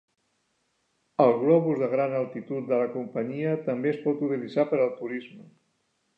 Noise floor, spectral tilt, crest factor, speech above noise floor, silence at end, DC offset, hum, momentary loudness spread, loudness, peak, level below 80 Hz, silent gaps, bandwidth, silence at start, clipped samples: -73 dBFS; -9.5 dB/octave; 20 dB; 48 dB; 0.75 s; under 0.1%; none; 11 LU; -26 LUFS; -8 dBFS; -82 dBFS; none; 5.4 kHz; 1.2 s; under 0.1%